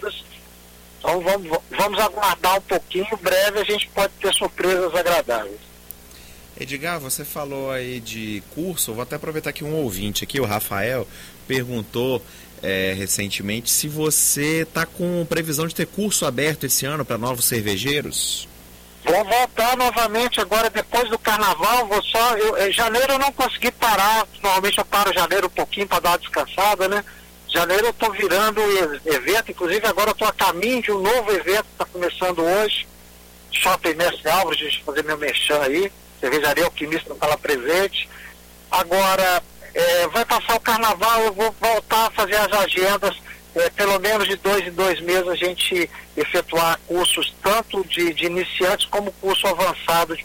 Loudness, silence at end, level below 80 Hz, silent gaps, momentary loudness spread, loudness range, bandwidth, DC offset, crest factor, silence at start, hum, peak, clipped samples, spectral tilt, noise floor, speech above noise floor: -20 LUFS; 0 s; -46 dBFS; none; 9 LU; 6 LU; 17 kHz; under 0.1%; 14 dB; 0 s; none; -6 dBFS; under 0.1%; -2.5 dB/octave; -45 dBFS; 25 dB